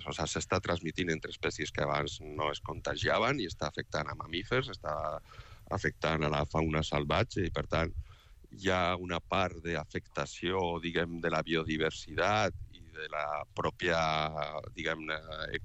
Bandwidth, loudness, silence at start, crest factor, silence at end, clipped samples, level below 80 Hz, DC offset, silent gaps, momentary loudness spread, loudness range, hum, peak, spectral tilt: 8.6 kHz; -33 LUFS; 0 s; 18 dB; 0 s; under 0.1%; -50 dBFS; under 0.1%; none; 8 LU; 2 LU; none; -16 dBFS; -5 dB/octave